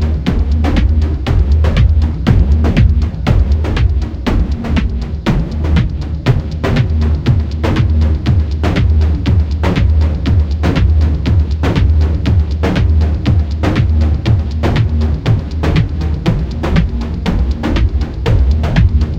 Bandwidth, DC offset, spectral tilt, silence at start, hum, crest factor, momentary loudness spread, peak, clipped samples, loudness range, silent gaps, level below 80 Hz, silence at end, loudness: 7.2 kHz; under 0.1%; -8 dB/octave; 0 s; none; 12 dB; 4 LU; 0 dBFS; under 0.1%; 3 LU; none; -14 dBFS; 0 s; -14 LUFS